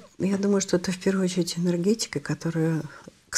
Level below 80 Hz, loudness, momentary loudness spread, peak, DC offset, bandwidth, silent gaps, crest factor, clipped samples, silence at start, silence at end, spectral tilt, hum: -60 dBFS; -26 LUFS; 5 LU; -10 dBFS; under 0.1%; 14 kHz; none; 16 dB; under 0.1%; 0 s; 0 s; -5.5 dB/octave; none